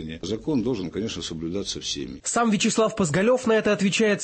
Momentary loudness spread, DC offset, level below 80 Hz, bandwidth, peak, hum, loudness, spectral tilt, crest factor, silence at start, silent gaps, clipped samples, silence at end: 9 LU; under 0.1%; -52 dBFS; 8.8 kHz; -10 dBFS; none; -24 LUFS; -4 dB/octave; 12 dB; 0 s; none; under 0.1%; 0 s